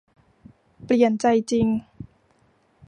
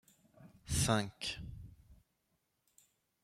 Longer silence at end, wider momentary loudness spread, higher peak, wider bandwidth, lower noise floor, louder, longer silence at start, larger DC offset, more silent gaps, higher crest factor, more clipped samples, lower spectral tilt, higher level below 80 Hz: second, 0.85 s vs 1.3 s; second, 10 LU vs 24 LU; first, -6 dBFS vs -18 dBFS; second, 10.5 kHz vs 15.5 kHz; second, -62 dBFS vs -82 dBFS; first, -21 LUFS vs -36 LUFS; first, 0.8 s vs 0.4 s; neither; neither; second, 18 dB vs 24 dB; neither; first, -6 dB/octave vs -4 dB/octave; about the same, -54 dBFS vs -56 dBFS